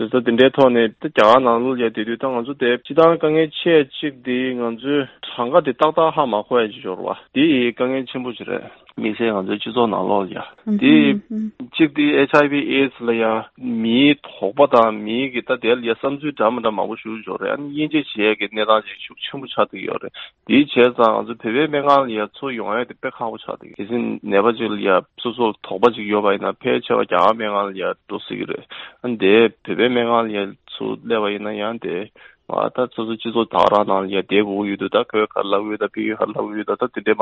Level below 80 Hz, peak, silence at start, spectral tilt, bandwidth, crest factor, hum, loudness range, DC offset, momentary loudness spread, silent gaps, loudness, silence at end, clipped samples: -62 dBFS; 0 dBFS; 0 s; -7 dB/octave; 7.2 kHz; 18 dB; none; 4 LU; under 0.1%; 13 LU; none; -19 LUFS; 0 s; under 0.1%